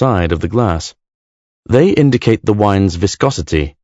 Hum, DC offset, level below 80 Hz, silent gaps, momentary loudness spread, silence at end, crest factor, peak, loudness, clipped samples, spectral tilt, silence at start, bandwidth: none; under 0.1%; -32 dBFS; 1.14-1.63 s; 7 LU; 0.15 s; 14 dB; 0 dBFS; -14 LUFS; 0.3%; -6.5 dB/octave; 0 s; 8 kHz